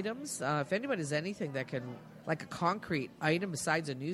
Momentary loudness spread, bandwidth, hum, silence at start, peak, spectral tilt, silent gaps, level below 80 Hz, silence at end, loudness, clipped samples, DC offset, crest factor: 6 LU; 13.5 kHz; none; 0 s; -16 dBFS; -5 dB/octave; none; -70 dBFS; 0 s; -35 LUFS; under 0.1%; under 0.1%; 20 dB